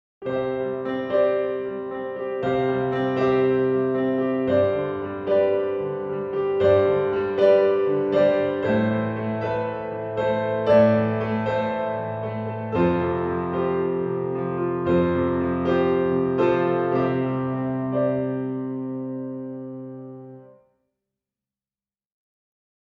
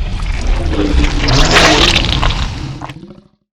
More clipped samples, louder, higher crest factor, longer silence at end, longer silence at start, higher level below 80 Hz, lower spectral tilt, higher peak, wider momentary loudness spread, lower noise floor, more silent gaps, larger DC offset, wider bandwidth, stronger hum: neither; second, -23 LUFS vs -12 LUFS; first, 18 dB vs 12 dB; first, 2.45 s vs 0.4 s; first, 0.2 s vs 0 s; second, -54 dBFS vs -16 dBFS; first, -9 dB/octave vs -4 dB/octave; second, -6 dBFS vs 0 dBFS; second, 10 LU vs 17 LU; first, under -90 dBFS vs -37 dBFS; neither; neither; second, 5.8 kHz vs 13.5 kHz; neither